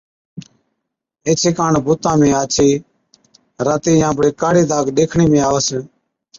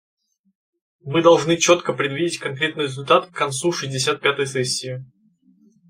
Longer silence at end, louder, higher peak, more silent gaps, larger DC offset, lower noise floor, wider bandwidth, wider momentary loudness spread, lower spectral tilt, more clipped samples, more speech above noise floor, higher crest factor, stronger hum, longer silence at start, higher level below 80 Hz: second, 0.55 s vs 0.85 s; first, -15 LUFS vs -20 LUFS; about the same, -2 dBFS vs -2 dBFS; neither; neither; first, -77 dBFS vs -57 dBFS; second, 7.6 kHz vs 16 kHz; second, 6 LU vs 10 LU; first, -5 dB/octave vs -3.5 dB/octave; neither; first, 63 dB vs 37 dB; second, 14 dB vs 20 dB; neither; second, 0.35 s vs 1.05 s; first, -46 dBFS vs -64 dBFS